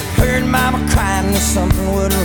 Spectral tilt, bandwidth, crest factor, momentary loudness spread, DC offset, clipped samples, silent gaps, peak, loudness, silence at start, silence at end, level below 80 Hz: -4.5 dB/octave; over 20 kHz; 12 dB; 2 LU; under 0.1%; under 0.1%; none; -2 dBFS; -15 LUFS; 0 s; 0 s; -20 dBFS